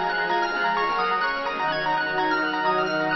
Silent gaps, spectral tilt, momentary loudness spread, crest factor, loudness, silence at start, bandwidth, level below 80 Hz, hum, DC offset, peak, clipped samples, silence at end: none; -5 dB/octave; 2 LU; 12 dB; -23 LUFS; 0 s; 6 kHz; -58 dBFS; none; under 0.1%; -12 dBFS; under 0.1%; 0 s